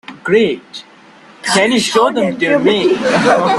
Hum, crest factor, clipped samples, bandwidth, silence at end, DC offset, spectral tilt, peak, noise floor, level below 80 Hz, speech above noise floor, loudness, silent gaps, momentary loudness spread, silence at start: none; 14 dB; under 0.1%; 12.5 kHz; 0 s; under 0.1%; -4 dB/octave; 0 dBFS; -41 dBFS; -54 dBFS; 29 dB; -13 LUFS; none; 12 LU; 0.1 s